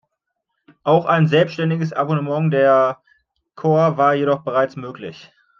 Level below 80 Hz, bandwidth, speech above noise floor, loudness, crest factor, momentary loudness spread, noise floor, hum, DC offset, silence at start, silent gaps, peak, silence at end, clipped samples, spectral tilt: -68 dBFS; 6.8 kHz; 59 dB; -18 LUFS; 16 dB; 15 LU; -76 dBFS; none; under 0.1%; 0.85 s; none; -2 dBFS; 0.4 s; under 0.1%; -8 dB/octave